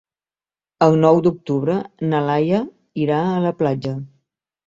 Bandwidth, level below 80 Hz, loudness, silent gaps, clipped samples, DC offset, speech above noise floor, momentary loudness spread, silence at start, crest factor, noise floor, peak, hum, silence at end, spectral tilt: 7.6 kHz; -58 dBFS; -19 LUFS; none; under 0.1%; under 0.1%; over 72 dB; 10 LU; 0.8 s; 18 dB; under -90 dBFS; -2 dBFS; none; 0.6 s; -8.5 dB/octave